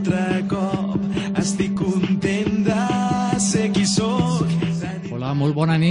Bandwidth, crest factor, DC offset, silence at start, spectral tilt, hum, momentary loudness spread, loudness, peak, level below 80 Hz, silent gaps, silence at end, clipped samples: 10.5 kHz; 16 dB; under 0.1%; 0 s; -5.5 dB/octave; none; 4 LU; -21 LUFS; -4 dBFS; -46 dBFS; none; 0 s; under 0.1%